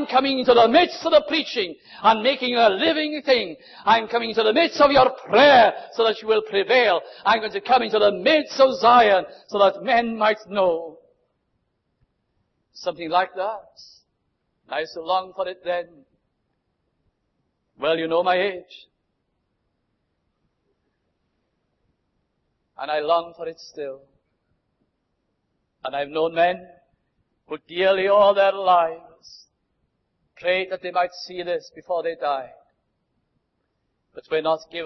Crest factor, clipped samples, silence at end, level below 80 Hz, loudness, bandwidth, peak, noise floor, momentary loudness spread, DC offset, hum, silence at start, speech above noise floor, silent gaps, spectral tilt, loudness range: 18 dB; under 0.1%; 0 s; -60 dBFS; -20 LUFS; 6.2 kHz; -4 dBFS; -74 dBFS; 15 LU; under 0.1%; none; 0 s; 53 dB; none; -4.5 dB/octave; 12 LU